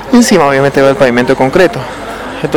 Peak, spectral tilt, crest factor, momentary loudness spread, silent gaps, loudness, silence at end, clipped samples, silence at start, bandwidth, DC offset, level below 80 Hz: 0 dBFS; -5 dB/octave; 8 dB; 14 LU; none; -8 LUFS; 0 s; 5%; 0 s; 19.5 kHz; under 0.1%; -36 dBFS